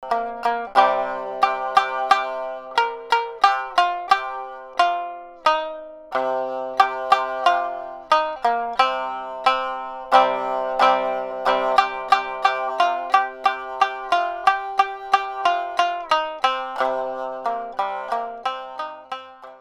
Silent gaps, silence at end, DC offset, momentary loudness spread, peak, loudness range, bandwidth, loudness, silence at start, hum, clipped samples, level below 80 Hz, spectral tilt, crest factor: none; 0.05 s; under 0.1%; 10 LU; 0 dBFS; 3 LU; 13 kHz; -21 LUFS; 0 s; none; under 0.1%; -60 dBFS; -2 dB/octave; 22 dB